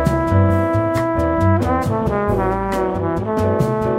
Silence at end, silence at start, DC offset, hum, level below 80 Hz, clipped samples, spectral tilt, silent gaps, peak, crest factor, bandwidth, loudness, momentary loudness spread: 0 s; 0 s; under 0.1%; none; -32 dBFS; under 0.1%; -8.5 dB/octave; none; -2 dBFS; 14 dB; 15 kHz; -18 LUFS; 4 LU